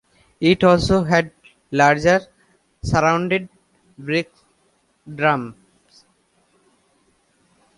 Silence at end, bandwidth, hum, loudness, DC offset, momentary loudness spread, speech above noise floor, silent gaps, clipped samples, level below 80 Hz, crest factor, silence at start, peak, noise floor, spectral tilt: 2.25 s; 11.5 kHz; none; -18 LUFS; under 0.1%; 20 LU; 46 dB; none; under 0.1%; -44 dBFS; 20 dB; 0.4 s; -2 dBFS; -63 dBFS; -6 dB/octave